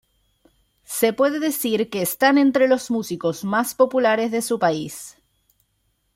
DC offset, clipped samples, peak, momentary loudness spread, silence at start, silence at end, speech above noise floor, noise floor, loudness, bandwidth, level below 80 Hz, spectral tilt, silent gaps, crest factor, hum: under 0.1%; under 0.1%; -2 dBFS; 11 LU; 0.9 s; 1.05 s; 49 dB; -69 dBFS; -20 LUFS; 16.5 kHz; -64 dBFS; -4 dB/octave; none; 18 dB; none